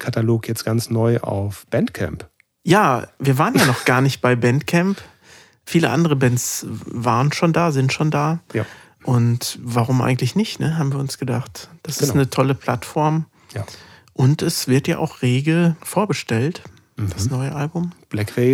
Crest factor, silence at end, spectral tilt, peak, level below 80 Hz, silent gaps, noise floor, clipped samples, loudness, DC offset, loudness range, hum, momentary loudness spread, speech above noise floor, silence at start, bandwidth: 18 dB; 0 s; -5.5 dB/octave; -2 dBFS; -54 dBFS; none; -49 dBFS; under 0.1%; -19 LUFS; under 0.1%; 3 LU; none; 11 LU; 30 dB; 0 s; 17.5 kHz